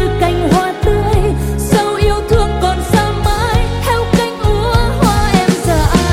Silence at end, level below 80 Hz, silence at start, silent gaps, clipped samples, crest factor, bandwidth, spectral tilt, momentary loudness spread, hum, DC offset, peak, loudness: 0 s; -18 dBFS; 0 s; none; under 0.1%; 12 dB; 16.5 kHz; -5.5 dB/octave; 3 LU; none; under 0.1%; 0 dBFS; -13 LUFS